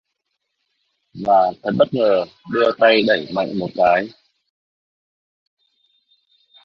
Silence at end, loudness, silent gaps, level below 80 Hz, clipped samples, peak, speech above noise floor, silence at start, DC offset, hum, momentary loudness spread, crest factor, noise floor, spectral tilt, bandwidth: 2.55 s; -17 LUFS; none; -60 dBFS; under 0.1%; -2 dBFS; 58 dB; 1.15 s; under 0.1%; none; 10 LU; 18 dB; -75 dBFS; -7 dB/octave; 6.4 kHz